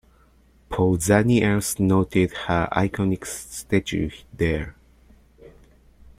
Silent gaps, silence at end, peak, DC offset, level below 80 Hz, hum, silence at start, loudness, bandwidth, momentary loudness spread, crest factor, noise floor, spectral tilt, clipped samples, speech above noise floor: none; 0.7 s; -4 dBFS; under 0.1%; -44 dBFS; none; 0.7 s; -22 LUFS; 16 kHz; 13 LU; 20 dB; -56 dBFS; -5.5 dB/octave; under 0.1%; 34 dB